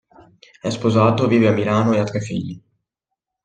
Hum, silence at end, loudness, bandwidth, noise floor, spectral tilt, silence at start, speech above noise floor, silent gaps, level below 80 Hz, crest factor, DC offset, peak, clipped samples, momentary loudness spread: none; 0.85 s; -18 LUFS; 9 kHz; -82 dBFS; -7 dB/octave; 0.65 s; 64 dB; none; -56 dBFS; 18 dB; under 0.1%; -2 dBFS; under 0.1%; 13 LU